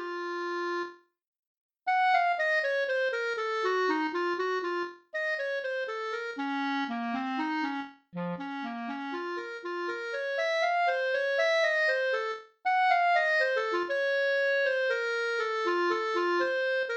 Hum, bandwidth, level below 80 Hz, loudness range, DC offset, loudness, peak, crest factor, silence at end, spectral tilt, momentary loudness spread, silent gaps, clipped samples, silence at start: none; 8.6 kHz; -84 dBFS; 7 LU; under 0.1%; -29 LUFS; -14 dBFS; 16 dB; 0 s; -4 dB/octave; 11 LU; 1.27-1.33 s, 1.39-1.69 s; under 0.1%; 0 s